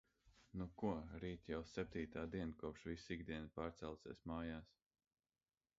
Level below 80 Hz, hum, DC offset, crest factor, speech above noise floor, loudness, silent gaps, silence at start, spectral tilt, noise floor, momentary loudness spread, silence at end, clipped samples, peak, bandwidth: -64 dBFS; none; under 0.1%; 20 dB; over 42 dB; -49 LUFS; none; 0.25 s; -6 dB/octave; under -90 dBFS; 7 LU; 1.15 s; under 0.1%; -30 dBFS; 7.6 kHz